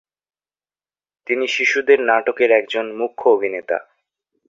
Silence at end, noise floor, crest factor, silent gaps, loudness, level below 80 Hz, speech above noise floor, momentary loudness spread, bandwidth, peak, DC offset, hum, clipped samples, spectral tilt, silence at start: 0.65 s; under -90 dBFS; 18 dB; none; -18 LUFS; -68 dBFS; over 73 dB; 10 LU; 7.6 kHz; -2 dBFS; under 0.1%; none; under 0.1%; -2.5 dB/octave; 1.3 s